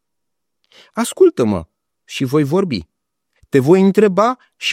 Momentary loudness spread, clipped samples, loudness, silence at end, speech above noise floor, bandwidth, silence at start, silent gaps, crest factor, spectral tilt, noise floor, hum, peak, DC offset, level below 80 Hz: 12 LU; under 0.1%; -15 LUFS; 0 s; 65 dB; 15.5 kHz; 0.95 s; none; 16 dB; -6 dB/octave; -80 dBFS; none; 0 dBFS; under 0.1%; -54 dBFS